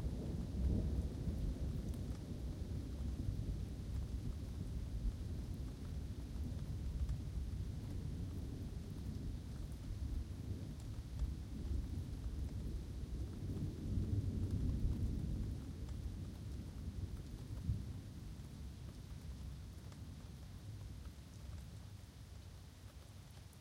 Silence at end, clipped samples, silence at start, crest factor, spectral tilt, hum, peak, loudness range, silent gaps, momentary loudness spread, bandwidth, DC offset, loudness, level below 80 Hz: 0 s; under 0.1%; 0 s; 18 dB; -7.5 dB/octave; none; -26 dBFS; 10 LU; none; 12 LU; 16 kHz; under 0.1%; -46 LUFS; -46 dBFS